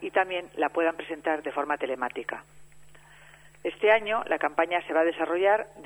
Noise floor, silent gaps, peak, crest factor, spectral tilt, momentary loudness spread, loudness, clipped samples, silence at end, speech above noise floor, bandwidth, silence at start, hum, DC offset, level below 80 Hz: -53 dBFS; none; -6 dBFS; 22 dB; -4.5 dB/octave; 11 LU; -27 LUFS; under 0.1%; 0 s; 26 dB; 10.5 kHz; 0 s; none; under 0.1%; -66 dBFS